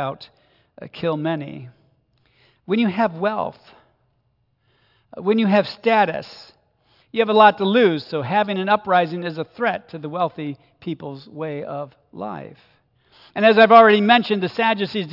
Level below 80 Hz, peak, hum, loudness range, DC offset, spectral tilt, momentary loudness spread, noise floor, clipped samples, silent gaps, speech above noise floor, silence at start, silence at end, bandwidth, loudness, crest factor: -68 dBFS; 0 dBFS; none; 11 LU; under 0.1%; -7.5 dB/octave; 19 LU; -67 dBFS; under 0.1%; none; 48 dB; 0 s; 0 s; 5.8 kHz; -18 LUFS; 20 dB